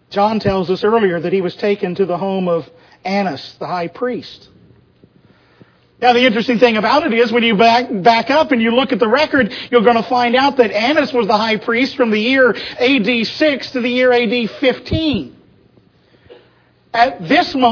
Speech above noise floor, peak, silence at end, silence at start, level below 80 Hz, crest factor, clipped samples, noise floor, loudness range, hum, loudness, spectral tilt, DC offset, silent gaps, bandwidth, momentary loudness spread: 38 dB; 0 dBFS; 0 s; 0.1 s; -48 dBFS; 16 dB; under 0.1%; -52 dBFS; 8 LU; none; -14 LUFS; -6 dB/octave; under 0.1%; none; 5.4 kHz; 9 LU